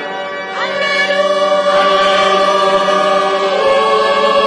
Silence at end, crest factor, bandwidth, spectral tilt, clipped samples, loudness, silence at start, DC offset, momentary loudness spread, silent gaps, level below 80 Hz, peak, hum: 0 s; 10 dB; 10.5 kHz; -3 dB/octave; under 0.1%; -12 LUFS; 0 s; under 0.1%; 7 LU; none; -54 dBFS; -2 dBFS; none